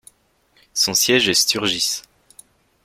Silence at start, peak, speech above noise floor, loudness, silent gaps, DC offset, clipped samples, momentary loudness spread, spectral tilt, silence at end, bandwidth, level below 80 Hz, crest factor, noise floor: 0.75 s; -2 dBFS; 42 dB; -17 LUFS; none; under 0.1%; under 0.1%; 10 LU; -1 dB/octave; 0.85 s; 16.5 kHz; -58 dBFS; 20 dB; -60 dBFS